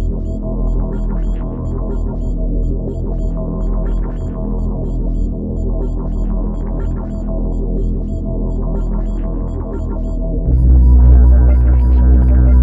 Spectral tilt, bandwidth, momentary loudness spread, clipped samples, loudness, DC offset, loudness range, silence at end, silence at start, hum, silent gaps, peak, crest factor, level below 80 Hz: -11.5 dB/octave; 1.9 kHz; 12 LU; under 0.1%; -17 LUFS; under 0.1%; 8 LU; 0 s; 0 s; none; none; 0 dBFS; 14 dB; -14 dBFS